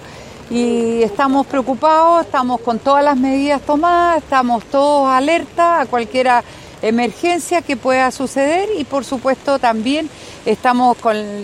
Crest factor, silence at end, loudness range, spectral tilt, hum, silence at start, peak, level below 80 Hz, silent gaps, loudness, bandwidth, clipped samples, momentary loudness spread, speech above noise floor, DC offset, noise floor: 14 dB; 0 s; 3 LU; -4.5 dB/octave; none; 0 s; 0 dBFS; -48 dBFS; none; -15 LUFS; 14.5 kHz; under 0.1%; 6 LU; 20 dB; under 0.1%; -35 dBFS